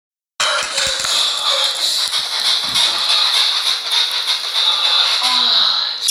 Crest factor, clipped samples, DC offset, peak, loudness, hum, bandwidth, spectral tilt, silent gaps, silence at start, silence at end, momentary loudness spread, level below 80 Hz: 16 dB; under 0.1%; under 0.1%; 0 dBFS; -14 LUFS; none; 17 kHz; 2 dB/octave; none; 0.4 s; 0 s; 5 LU; -56 dBFS